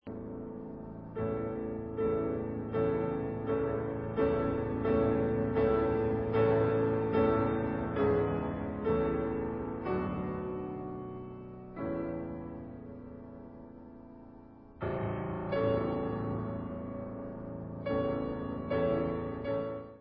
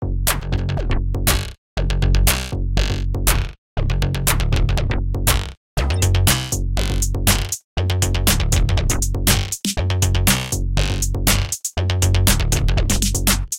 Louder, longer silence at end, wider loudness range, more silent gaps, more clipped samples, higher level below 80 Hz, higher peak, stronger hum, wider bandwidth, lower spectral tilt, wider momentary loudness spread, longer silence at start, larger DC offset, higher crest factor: second, -33 LUFS vs -19 LUFS; about the same, 0 s vs 0 s; first, 12 LU vs 2 LU; second, none vs 1.58-1.76 s, 3.58-3.76 s, 5.57-5.76 s, 7.64-7.76 s; neither; second, -50 dBFS vs -22 dBFS; second, -16 dBFS vs 0 dBFS; neither; second, 5 kHz vs 17 kHz; first, -7.5 dB/octave vs -3.5 dB/octave; first, 16 LU vs 6 LU; about the same, 0.05 s vs 0 s; neither; about the same, 16 dB vs 18 dB